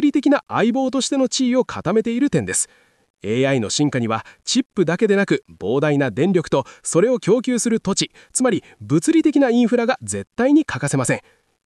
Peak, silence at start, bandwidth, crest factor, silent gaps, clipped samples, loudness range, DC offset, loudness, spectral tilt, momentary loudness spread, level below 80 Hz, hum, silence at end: -6 dBFS; 0 s; 12.5 kHz; 12 dB; 3.10-3.14 s, 4.66-4.70 s; under 0.1%; 2 LU; under 0.1%; -19 LUFS; -4.5 dB/octave; 6 LU; -58 dBFS; none; 0.45 s